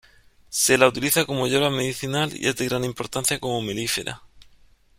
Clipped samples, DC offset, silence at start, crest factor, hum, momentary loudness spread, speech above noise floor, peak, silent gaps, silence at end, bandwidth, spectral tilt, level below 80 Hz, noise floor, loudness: under 0.1%; under 0.1%; 0.5 s; 22 dB; none; 9 LU; 32 dB; -2 dBFS; none; 0.55 s; 16.5 kHz; -3 dB/octave; -54 dBFS; -55 dBFS; -22 LUFS